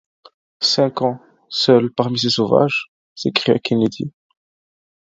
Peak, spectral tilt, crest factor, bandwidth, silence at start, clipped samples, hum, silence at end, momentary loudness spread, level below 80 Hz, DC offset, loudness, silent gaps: 0 dBFS; -5 dB/octave; 18 dB; 7.8 kHz; 0.6 s; under 0.1%; none; 0.95 s; 12 LU; -60 dBFS; under 0.1%; -18 LUFS; 2.88-3.16 s